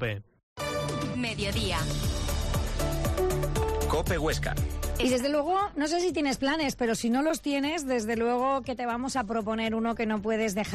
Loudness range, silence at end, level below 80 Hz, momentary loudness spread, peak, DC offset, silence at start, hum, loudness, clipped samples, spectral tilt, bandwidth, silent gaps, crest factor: 2 LU; 0 s; -36 dBFS; 5 LU; -18 dBFS; under 0.1%; 0 s; none; -29 LUFS; under 0.1%; -5 dB/octave; 15 kHz; 0.43-0.56 s; 12 dB